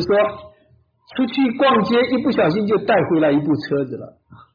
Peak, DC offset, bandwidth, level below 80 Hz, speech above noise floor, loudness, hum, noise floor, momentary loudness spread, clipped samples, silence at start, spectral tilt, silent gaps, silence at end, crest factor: -8 dBFS; under 0.1%; 5.2 kHz; -56 dBFS; 39 dB; -18 LUFS; none; -57 dBFS; 10 LU; under 0.1%; 0 s; -8 dB/octave; none; 0.2 s; 12 dB